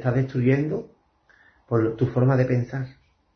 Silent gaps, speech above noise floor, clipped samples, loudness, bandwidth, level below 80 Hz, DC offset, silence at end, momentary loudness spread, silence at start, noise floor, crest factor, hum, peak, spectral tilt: none; 38 dB; under 0.1%; -23 LUFS; 6.2 kHz; -54 dBFS; under 0.1%; 0.45 s; 12 LU; 0 s; -60 dBFS; 16 dB; none; -8 dBFS; -10 dB/octave